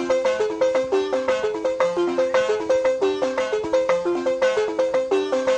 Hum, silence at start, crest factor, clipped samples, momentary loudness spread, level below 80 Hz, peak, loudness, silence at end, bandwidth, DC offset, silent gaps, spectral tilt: none; 0 s; 14 dB; under 0.1%; 2 LU; -58 dBFS; -6 dBFS; -22 LUFS; 0 s; 9.2 kHz; under 0.1%; none; -4 dB/octave